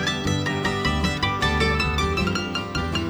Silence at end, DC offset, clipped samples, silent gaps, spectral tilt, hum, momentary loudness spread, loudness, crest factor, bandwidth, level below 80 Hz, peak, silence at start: 0 s; under 0.1%; under 0.1%; none; -4.5 dB/octave; none; 5 LU; -23 LUFS; 16 dB; 20 kHz; -32 dBFS; -6 dBFS; 0 s